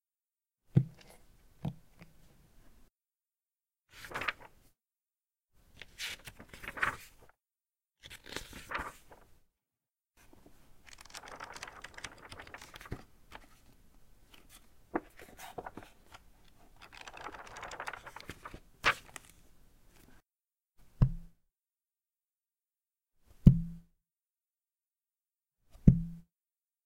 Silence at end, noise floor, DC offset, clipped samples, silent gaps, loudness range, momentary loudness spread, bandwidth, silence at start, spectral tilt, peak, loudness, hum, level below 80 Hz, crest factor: 0.65 s; under -90 dBFS; under 0.1%; under 0.1%; none; 15 LU; 27 LU; 16.5 kHz; 0.75 s; -6 dB/octave; -4 dBFS; -35 LUFS; none; -48 dBFS; 34 dB